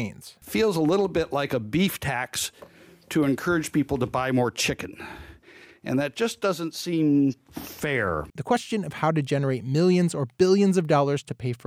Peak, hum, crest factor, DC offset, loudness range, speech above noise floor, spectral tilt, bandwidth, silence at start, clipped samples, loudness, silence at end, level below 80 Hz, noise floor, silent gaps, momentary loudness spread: -8 dBFS; none; 18 dB; under 0.1%; 4 LU; 26 dB; -5.5 dB/octave; 16.5 kHz; 0 s; under 0.1%; -25 LUFS; 0.1 s; -54 dBFS; -51 dBFS; none; 11 LU